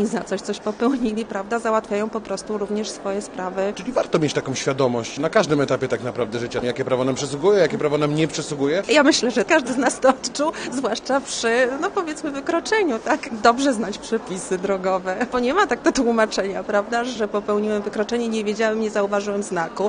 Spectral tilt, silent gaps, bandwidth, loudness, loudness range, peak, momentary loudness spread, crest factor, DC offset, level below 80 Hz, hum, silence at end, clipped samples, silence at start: -4.5 dB/octave; none; 10 kHz; -21 LUFS; 5 LU; 0 dBFS; 8 LU; 20 dB; under 0.1%; -54 dBFS; none; 0 s; under 0.1%; 0 s